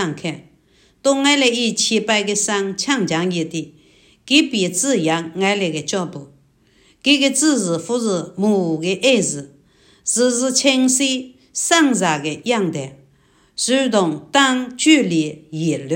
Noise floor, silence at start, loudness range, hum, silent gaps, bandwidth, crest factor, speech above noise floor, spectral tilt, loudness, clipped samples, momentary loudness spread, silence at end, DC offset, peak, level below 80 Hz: -55 dBFS; 0 s; 2 LU; none; none; 16.5 kHz; 18 dB; 38 dB; -3 dB/octave; -17 LUFS; under 0.1%; 12 LU; 0 s; under 0.1%; 0 dBFS; -64 dBFS